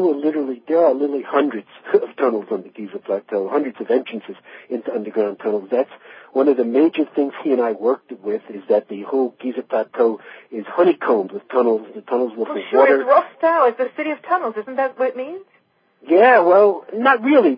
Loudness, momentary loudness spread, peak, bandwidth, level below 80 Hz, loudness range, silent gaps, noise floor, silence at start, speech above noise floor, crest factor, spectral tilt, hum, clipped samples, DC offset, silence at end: -19 LUFS; 14 LU; 0 dBFS; 5.2 kHz; -86 dBFS; 5 LU; none; -60 dBFS; 0 s; 42 dB; 18 dB; -10 dB/octave; none; under 0.1%; under 0.1%; 0 s